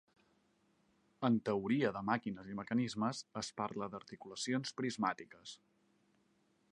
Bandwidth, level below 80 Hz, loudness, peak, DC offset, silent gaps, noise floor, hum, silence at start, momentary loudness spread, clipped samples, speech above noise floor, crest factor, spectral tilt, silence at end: 11 kHz; -76 dBFS; -38 LUFS; -18 dBFS; under 0.1%; none; -76 dBFS; none; 1.2 s; 15 LU; under 0.1%; 37 dB; 22 dB; -5 dB/octave; 1.15 s